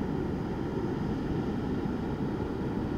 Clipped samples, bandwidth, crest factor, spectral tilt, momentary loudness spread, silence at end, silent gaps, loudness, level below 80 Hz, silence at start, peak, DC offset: under 0.1%; 15 kHz; 12 dB; -8.5 dB/octave; 1 LU; 0 s; none; -33 LUFS; -44 dBFS; 0 s; -20 dBFS; under 0.1%